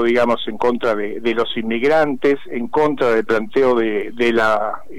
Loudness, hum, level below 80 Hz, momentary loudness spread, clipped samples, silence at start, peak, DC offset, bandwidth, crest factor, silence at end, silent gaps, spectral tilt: -18 LUFS; none; -50 dBFS; 5 LU; under 0.1%; 0 s; -8 dBFS; 4%; 13 kHz; 10 dB; 0 s; none; -5.5 dB/octave